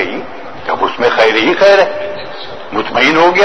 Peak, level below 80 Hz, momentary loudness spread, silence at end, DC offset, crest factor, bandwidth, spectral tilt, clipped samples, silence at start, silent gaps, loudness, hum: 0 dBFS; -46 dBFS; 17 LU; 0 s; 3%; 12 dB; 8.8 kHz; -4 dB/octave; 0.4%; 0 s; none; -11 LUFS; none